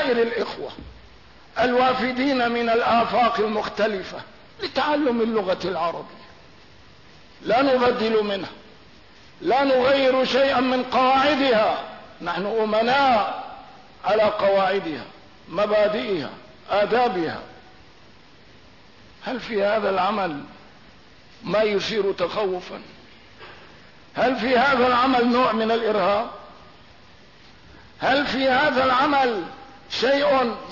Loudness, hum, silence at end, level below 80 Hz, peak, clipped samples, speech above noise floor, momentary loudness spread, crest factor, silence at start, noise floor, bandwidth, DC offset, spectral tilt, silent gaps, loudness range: -21 LUFS; none; 0 s; -56 dBFS; -10 dBFS; under 0.1%; 30 dB; 16 LU; 12 dB; 0 s; -51 dBFS; 6 kHz; 0.2%; -5 dB/octave; none; 7 LU